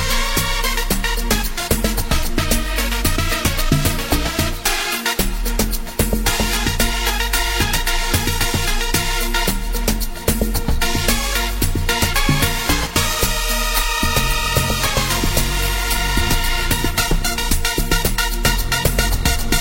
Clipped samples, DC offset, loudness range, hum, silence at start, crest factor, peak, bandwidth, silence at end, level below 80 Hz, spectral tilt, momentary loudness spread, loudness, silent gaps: under 0.1%; under 0.1%; 2 LU; none; 0 s; 18 dB; 0 dBFS; 16.5 kHz; 0 s; -22 dBFS; -3 dB/octave; 3 LU; -18 LUFS; none